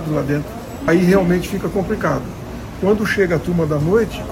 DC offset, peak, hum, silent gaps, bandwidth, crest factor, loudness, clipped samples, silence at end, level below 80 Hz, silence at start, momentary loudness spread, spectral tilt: under 0.1%; -2 dBFS; none; none; 16.5 kHz; 16 dB; -18 LUFS; under 0.1%; 0 s; -36 dBFS; 0 s; 10 LU; -7 dB/octave